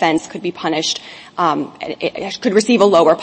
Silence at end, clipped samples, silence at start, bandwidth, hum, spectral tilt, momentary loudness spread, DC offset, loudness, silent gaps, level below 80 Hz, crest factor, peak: 0 s; under 0.1%; 0 s; 8.8 kHz; none; -4 dB/octave; 13 LU; under 0.1%; -17 LUFS; none; -60 dBFS; 16 dB; 0 dBFS